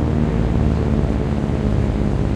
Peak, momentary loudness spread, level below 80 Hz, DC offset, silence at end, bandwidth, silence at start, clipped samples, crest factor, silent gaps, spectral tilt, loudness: -4 dBFS; 2 LU; -22 dBFS; under 0.1%; 0 s; 9.2 kHz; 0 s; under 0.1%; 14 dB; none; -9 dB/octave; -19 LUFS